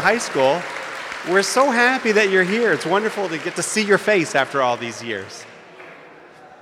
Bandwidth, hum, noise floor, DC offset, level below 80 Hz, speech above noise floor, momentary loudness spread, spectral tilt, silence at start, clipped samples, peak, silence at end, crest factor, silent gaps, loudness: 15.5 kHz; none; -44 dBFS; under 0.1%; -68 dBFS; 25 dB; 13 LU; -3.5 dB/octave; 0 s; under 0.1%; -4 dBFS; 0.05 s; 16 dB; none; -19 LUFS